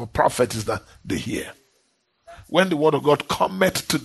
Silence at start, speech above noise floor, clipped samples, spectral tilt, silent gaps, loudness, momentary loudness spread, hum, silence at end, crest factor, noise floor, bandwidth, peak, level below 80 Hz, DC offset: 0 s; 46 dB; under 0.1%; -4.5 dB/octave; none; -22 LUFS; 11 LU; none; 0 s; 18 dB; -67 dBFS; 12.5 kHz; -4 dBFS; -50 dBFS; under 0.1%